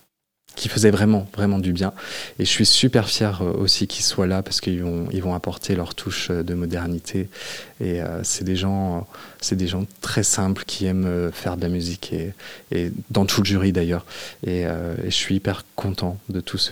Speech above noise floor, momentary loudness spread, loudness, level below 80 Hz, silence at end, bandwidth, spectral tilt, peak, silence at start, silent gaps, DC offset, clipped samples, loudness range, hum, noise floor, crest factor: 36 dB; 11 LU; -22 LUFS; -50 dBFS; 0 s; 17.5 kHz; -4.5 dB/octave; 0 dBFS; 0.5 s; none; 0.3%; under 0.1%; 6 LU; none; -58 dBFS; 22 dB